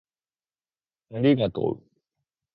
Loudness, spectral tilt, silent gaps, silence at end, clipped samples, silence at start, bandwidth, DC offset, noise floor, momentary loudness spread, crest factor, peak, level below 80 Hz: -24 LUFS; -11 dB/octave; none; 0.75 s; under 0.1%; 1.1 s; 5.2 kHz; under 0.1%; under -90 dBFS; 17 LU; 20 dB; -8 dBFS; -60 dBFS